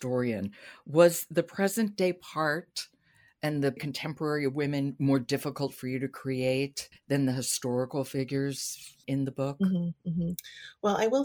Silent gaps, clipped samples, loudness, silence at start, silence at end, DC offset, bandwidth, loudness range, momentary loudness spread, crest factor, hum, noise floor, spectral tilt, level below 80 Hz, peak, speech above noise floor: none; under 0.1%; -30 LUFS; 0 s; 0 s; under 0.1%; over 20 kHz; 3 LU; 8 LU; 22 dB; none; -64 dBFS; -5.5 dB/octave; -66 dBFS; -8 dBFS; 35 dB